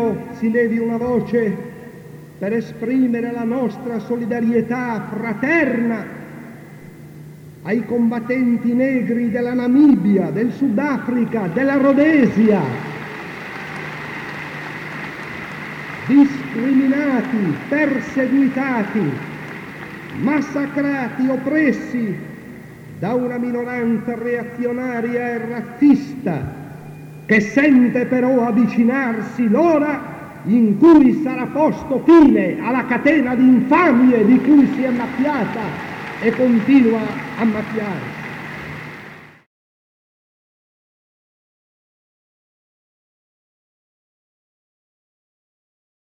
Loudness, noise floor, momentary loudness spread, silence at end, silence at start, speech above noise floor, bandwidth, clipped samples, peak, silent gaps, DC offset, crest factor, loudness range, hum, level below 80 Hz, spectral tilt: -17 LUFS; -39 dBFS; 17 LU; 6.85 s; 0 s; 23 dB; 8 kHz; under 0.1%; -2 dBFS; none; under 0.1%; 16 dB; 8 LU; none; -54 dBFS; -8 dB/octave